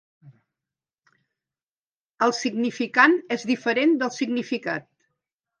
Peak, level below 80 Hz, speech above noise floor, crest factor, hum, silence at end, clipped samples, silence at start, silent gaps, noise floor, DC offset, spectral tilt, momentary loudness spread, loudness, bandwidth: -2 dBFS; -78 dBFS; over 68 dB; 22 dB; none; 0.8 s; under 0.1%; 0.25 s; 1.63-2.18 s; under -90 dBFS; under 0.1%; -4 dB/octave; 10 LU; -23 LUFS; 9.8 kHz